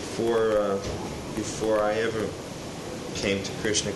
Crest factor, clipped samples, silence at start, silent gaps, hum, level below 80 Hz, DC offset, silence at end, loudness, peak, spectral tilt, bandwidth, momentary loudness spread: 16 dB; under 0.1%; 0 s; none; none; -48 dBFS; under 0.1%; 0 s; -28 LUFS; -10 dBFS; -4 dB/octave; 12 kHz; 12 LU